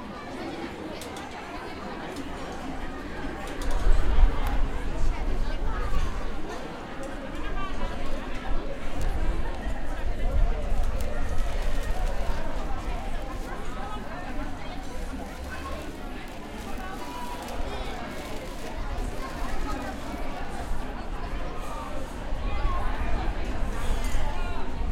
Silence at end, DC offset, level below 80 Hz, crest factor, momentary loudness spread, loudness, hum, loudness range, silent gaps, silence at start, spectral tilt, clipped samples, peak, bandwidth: 0 s; under 0.1%; -28 dBFS; 20 dB; 6 LU; -34 LUFS; none; 5 LU; none; 0 s; -5.5 dB/octave; under 0.1%; -6 dBFS; 12 kHz